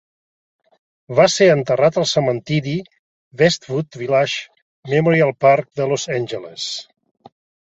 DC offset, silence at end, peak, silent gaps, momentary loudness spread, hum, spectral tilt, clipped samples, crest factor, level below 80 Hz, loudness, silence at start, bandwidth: under 0.1%; 0.95 s; -2 dBFS; 2.99-3.31 s, 4.62-4.83 s; 12 LU; none; -5 dB/octave; under 0.1%; 18 dB; -58 dBFS; -18 LUFS; 1.1 s; 8.2 kHz